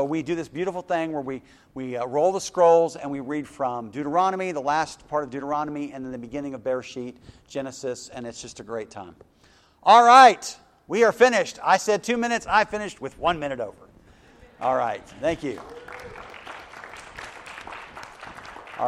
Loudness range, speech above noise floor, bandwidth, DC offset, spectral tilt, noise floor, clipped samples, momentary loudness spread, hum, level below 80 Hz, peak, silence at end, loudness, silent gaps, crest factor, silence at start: 15 LU; 35 dB; 13 kHz; under 0.1%; -4 dB/octave; -58 dBFS; under 0.1%; 22 LU; none; -58 dBFS; 0 dBFS; 0 s; -22 LUFS; none; 24 dB; 0 s